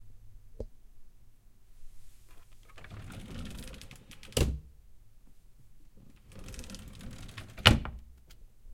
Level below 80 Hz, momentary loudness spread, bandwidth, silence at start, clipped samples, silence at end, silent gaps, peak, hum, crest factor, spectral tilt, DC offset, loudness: -44 dBFS; 27 LU; 16.5 kHz; 0 s; under 0.1%; 0 s; none; -2 dBFS; none; 34 dB; -4 dB/octave; under 0.1%; -30 LUFS